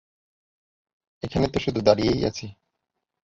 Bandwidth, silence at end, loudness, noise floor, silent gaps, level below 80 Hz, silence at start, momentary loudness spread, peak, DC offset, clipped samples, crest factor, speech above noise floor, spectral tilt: 7.8 kHz; 0.75 s; -23 LUFS; -81 dBFS; none; -46 dBFS; 1.25 s; 17 LU; -2 dBFS; under 0.1%; under 0.1%; 24 dB; 58 dB; -6 dB/octave